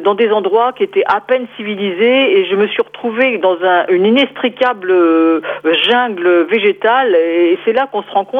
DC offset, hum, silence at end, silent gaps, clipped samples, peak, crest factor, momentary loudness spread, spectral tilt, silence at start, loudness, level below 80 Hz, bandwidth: under 0.1%; none; 0 s; none; under 0.1%; -2 dBFS; 12 dB; 6 LU; -6.5 dB/octave; 0 s; -13 LUFS; -66 dBFS; 5.2 kHz